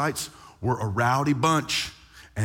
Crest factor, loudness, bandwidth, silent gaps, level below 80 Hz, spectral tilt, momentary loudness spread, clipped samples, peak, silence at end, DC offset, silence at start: 16 dB; -25 LUFS; 17 kHz; none; -54 dBFS; -4.5 dB/octave; 12 LU; under 0.1%; -10 dBFS; 0 s; under 0.1%; 0 s